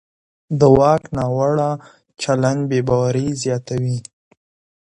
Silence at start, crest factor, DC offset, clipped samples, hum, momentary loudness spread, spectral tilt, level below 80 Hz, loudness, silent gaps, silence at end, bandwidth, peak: 0.5 s; 18 dB; under 0.1%; under 0.1%; none; 12 LU; -7 dB/octave; -44 dBFS; -18 LUFS; none; 0.85 s; 10.5 kHz; 0 dBFS